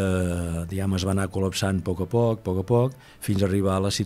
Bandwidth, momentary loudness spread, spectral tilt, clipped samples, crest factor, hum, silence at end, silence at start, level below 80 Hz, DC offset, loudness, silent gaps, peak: 15 kHz; 6 LU; -6 dB/octave; under 0.1%; 16 dB; none; 0 s; 0 s; -46 dBFS; under 0.1%; -25 LUFS; none; -8 dBFS